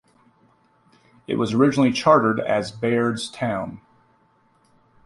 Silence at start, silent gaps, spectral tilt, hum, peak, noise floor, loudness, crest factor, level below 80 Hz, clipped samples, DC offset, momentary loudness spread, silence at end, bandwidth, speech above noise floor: 1.3 s; none; -6 dB/octave; none; -2 dBFS; -61 dBFS; -21 LUFS; 20 dB; -60 dBFS; under 0.1%; under 0.1%; 11 LU; 1.3 s; 11.5 kHz; 41 dB